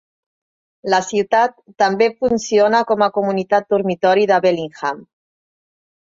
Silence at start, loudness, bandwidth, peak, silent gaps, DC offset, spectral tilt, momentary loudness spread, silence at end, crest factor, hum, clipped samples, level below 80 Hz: 0.85 s; -17 LUFS; 7.8 kHz; -2 dBFS; none; under 0.1%; -4.5 dB/octave; 9 LU; 1.1 s; 16 dB; none; under 0.1%; -60 dBFS